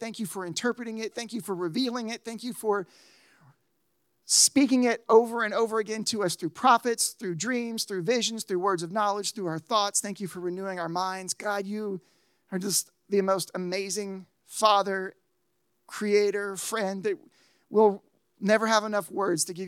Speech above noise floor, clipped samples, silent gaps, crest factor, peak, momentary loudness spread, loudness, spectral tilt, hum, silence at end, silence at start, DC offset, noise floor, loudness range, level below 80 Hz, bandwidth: 49 dB; under 0.1%; none; 22 dB; -6 dBFS; 12 LU; -27 LUFS; -3 dB/octave; none; 0 s; 0 s; under 0.1%; -76 dBFS; 6 LU; -86 dBFS; 16.5 kHz